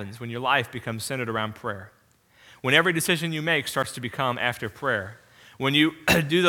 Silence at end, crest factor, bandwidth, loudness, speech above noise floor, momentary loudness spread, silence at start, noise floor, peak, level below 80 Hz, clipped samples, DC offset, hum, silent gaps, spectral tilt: 0 s; 24 dB; 19 kHz; -25 LUFS; 34 dB; 12 LU; 0 s; -59 dBFS; -2 dBFS; -56 dBFS; under 0.1%; under 0.1%; none; none; -4 dB/octave